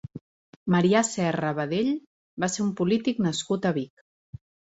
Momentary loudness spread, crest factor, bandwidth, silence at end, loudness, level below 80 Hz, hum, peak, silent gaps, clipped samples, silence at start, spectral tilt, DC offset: 16 LU; 18 dB; 8.2 kHz; 0.9 s; -26 LUFS; -62 dBFS; none; -8 dBFS; 0.21-0.66 s, 2.07-2.37 s; under 0.1%; 0.15 s; -5 dB/octave; under 0.1%